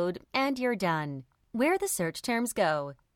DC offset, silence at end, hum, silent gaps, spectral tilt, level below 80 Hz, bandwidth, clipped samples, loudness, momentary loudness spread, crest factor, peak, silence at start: under 0.1%; 0.2 s; none; none; -4 dB/octave; -66 dBFS; 17 kHz; under 0.1%; -29 LUFS; 8 LU; 18 dB; -12 dBFS; 0 s